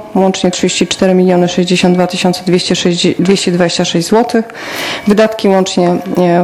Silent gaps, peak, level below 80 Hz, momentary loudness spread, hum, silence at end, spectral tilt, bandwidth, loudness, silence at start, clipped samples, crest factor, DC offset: none; 0 dBFS; -46 dBFS; 4 LU; none; 0 s; -5 dB/octave; 15.5 kHz; -11 LUFS; 0 s; 0.3%; 10 dB; under 0.1%